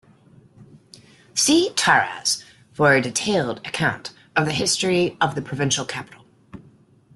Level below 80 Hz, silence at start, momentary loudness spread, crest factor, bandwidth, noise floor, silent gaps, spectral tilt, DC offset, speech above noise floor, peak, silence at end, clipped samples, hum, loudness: -60 dBFS; 0.6 s; 10 LU; 20 dB; 12.5 kHz; -53 dBFS; none; -3 dB/octave; under 0.1%; 32 dB; -2 dBFS; 0.55 s; under 0.1%; none; -20 LUFS